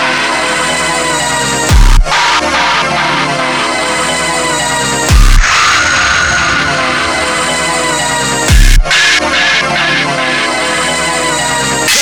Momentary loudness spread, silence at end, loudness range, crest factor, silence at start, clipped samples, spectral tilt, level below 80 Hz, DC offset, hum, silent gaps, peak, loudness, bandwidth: 4 LU; 0 s; 1 LU; 10 dB; 0 s; 1%; -2.5 dB/octave; -14 dBFS; 0.7%; none; none; 0 dBFS; -10 LUFS; 19 kHz